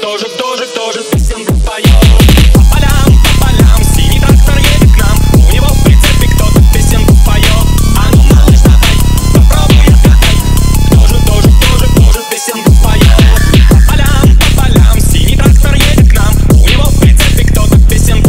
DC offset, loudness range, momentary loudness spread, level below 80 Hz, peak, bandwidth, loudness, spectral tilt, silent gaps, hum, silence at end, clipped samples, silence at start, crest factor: under 0.1%; 1 LU; 5 LU; -6 dBFS; 0 dBFS; 16.5 kHz; -7 LUFS; -5 dB/octave; none; none; 0 s; 2%; 0 s; 4 dB